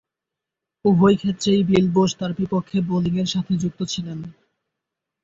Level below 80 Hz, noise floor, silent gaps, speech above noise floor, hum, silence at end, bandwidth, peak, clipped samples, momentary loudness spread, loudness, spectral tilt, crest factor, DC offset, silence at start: -54 dBFS; -85 dBFS; none; 65 dB; none; 0.9 s; 7.8 kHz; -4 dBFS; under 0.1%; 11 LU; -20 LUFS; -6.5 dB/octave; 16 dB; under 0.1%; 0.85 s